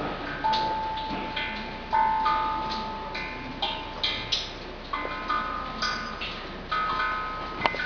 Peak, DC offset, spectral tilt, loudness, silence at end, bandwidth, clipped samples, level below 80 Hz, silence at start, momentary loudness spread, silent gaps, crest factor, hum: -4 dBFS; under 0.1%; -3.5 dB/octave; -29 LUFS; 0 s; 5.4 kHz; under 0.1%; -44 dBFS; 0 s; 8 LU; none; 26 dB; none